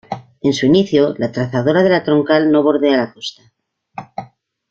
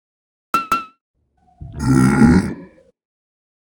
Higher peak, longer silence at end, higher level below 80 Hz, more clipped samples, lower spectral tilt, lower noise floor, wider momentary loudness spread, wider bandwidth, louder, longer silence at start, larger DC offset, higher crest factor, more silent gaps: about the same, -2 dBFS vs 0 dBFS; second, 0.45 s vs 1.15 s; second, -54 dBFS vs -36 dBFS; neither; about the same, -6.5 dB/octave vs -7 dB/octave; about the same, -42 dBFS vs -42 dBFS; about the same, 18 LU vs 18 LU; second, 7.6 kHz vs 17.5 kHz; about the same, -15 LUFS vs -16 LUFS; second, 0.1 s vs 0.55 s; neither; second, 14 dB vs 20 dB; second, none vs 1.01-1.14 s